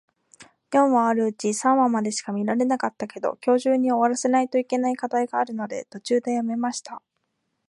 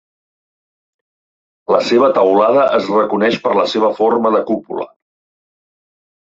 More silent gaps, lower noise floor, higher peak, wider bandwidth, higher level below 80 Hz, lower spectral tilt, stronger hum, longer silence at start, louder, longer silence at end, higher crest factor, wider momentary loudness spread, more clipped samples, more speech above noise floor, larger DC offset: neither; second, -76 dBFS vs under -90 dBFS; second, -8 dBFS vs -2 dBFS; first, 11.5 kHz vs 7.8 kHz; second, -76 dBFS vs -62 dBFS; about the same, -4.5 dB/octave vs -5.5 dB/octave; neither; second, 0.4 s vs 1.7 s; second, -23 LUFS vs -14 LUFS; second, 0.7 s vs 1.5 s; about the same, 16 dB vs 14 dB; second, 9 LU vs 12 LU; neither; second, 53 dB vs over 77 dB; neither